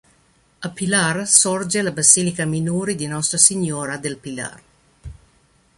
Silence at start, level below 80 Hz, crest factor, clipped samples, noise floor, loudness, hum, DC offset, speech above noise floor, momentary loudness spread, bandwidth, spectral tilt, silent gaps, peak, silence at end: 0.6 s; -52 dBFS; 20 dB; under 0.1%; -58 dBFS; -17 LUFS; none; under 0.1%; 39 dB; 17 LU; 14.5 kHz; -2.5 dB/octave; none; 0 dBFS; 0.65 s